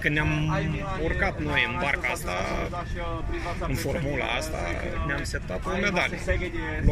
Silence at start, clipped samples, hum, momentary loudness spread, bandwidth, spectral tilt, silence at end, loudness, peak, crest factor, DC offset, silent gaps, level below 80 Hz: 0 s; under 0.1%; none; 7 LU; 15.5 kHz; -5.5 dB/octave; 0 s; -28 LUFS; -8 dBFS; 18 dB; under 0.1%; none; -34 dBFS